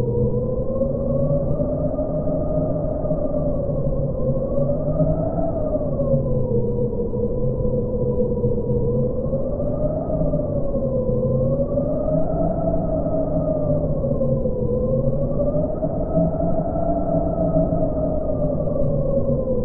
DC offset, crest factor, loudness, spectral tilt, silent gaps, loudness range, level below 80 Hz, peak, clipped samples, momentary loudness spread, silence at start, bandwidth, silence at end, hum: under 0.1%; 14 dB; -22 LUFS; -16 dB/octave; none; 1 LU; -30 dBFS; -6 dBFS; under 0.1%; 3 LU; 0 s; 1.8 kHz; 0 s; none